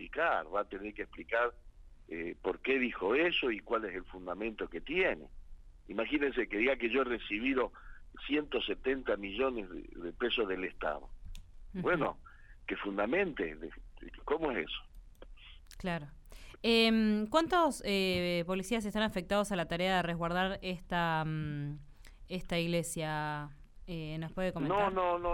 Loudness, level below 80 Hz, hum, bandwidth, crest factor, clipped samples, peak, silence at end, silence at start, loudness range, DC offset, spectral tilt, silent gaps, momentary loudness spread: -34 LUFS; -52 dBFS; none; 16 kHz; 22 dB; under 0.1%; -14 dBFS; 0 s; 0 s; 6 LU; under 0.1%; -5 dB/octave; none; 14 LU